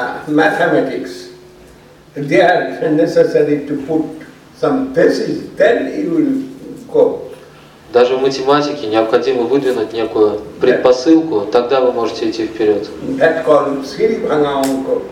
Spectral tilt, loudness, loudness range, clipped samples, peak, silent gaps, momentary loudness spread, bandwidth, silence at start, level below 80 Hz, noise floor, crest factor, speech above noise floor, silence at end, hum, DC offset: -5.5 dB/octave; -14 LUFS; 2 LU; under 0.1%; 0 dBFS; none; 9 LU; 15.5 kHz; 0 s; -52 dBFS; -41 dBFS; 14 dB; 28 dB; 0 s; none; under 0.1%